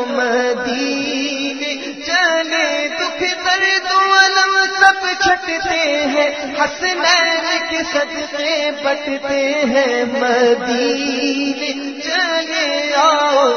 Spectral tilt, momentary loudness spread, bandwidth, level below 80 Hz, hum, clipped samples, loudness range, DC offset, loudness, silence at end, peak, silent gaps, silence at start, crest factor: -1.5 dB/octave; 8 LU; 10 kHz; -54 dBFS; none; under 0.1%; 3 LU; 0.2%; -15 LUFS; 0 s; 0 dBFS; none; 0 s; 16 dB